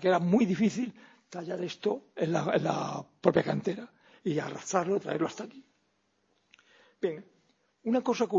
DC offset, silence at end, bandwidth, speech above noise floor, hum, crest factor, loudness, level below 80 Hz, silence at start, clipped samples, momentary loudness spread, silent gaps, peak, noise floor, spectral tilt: under 0.1%; 0 s; 7.8 kHz; 45 dB; none; 22 dB; -30 LUFS; -72 dBFS; 0 s; under 0.1%; 15 LU; none; -8 dBFS; -74 dBFS; -6 dB/octave